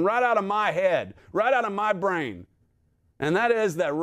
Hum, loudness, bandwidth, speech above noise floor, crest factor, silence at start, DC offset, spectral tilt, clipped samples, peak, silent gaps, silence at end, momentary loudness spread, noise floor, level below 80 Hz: none; -24 LUFS; 15 kHz; 42 dB; 16 dB; 0 s; under 0.1%; -5.5 dB/octave; under 0.1%; -10 dBFS; none; 0 s; 9 LU; -66 dBFS; -66 dBFS